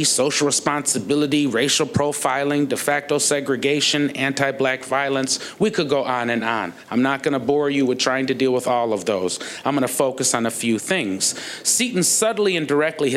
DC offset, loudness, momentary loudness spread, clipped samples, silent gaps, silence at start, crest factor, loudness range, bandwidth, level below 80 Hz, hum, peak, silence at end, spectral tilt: under 0.1%; -20 LUFS; 4 LU; under 0.1%; none; 0 s; 18 dB; 2 LU; 16 kHz; -64 dBFS; none; -2 dBFS; 0 s; -3 dB/octave